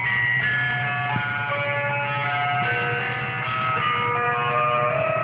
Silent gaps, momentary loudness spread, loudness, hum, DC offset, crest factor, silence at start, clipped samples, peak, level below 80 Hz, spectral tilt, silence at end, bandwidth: none; 4 LU; -22 LUFS; none; under 0.1%; 12 dB; 0 s; under 0.1%; -10 dBFS; -58 dBFS; -9 dB/octave; 0 s; 5.2 kHz